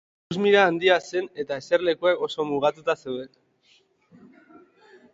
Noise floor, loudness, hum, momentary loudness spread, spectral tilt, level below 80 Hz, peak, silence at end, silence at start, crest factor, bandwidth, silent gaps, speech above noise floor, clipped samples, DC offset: -62 dBFS; -23 LUFS; none; 15 LU; -5 dB/octave; -68 dBFS; -4 dBFS; 1.85 s; 0.3 s; 20 dB; 7.8 kHz; none; 39 dB; under 0.1%; under 0.1%